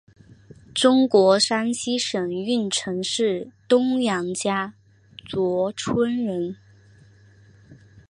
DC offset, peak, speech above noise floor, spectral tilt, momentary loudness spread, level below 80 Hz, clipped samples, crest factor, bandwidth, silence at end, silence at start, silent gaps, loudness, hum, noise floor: under 0.1%; -4 dBFS; 30 dB; -4 dB/octave; 13 LU; -62 dBFS; under 0.1%; 20 dB; 11 kHz; 0.35 s; 0.75 s; none; -22 LUFS; none; -52 dBFS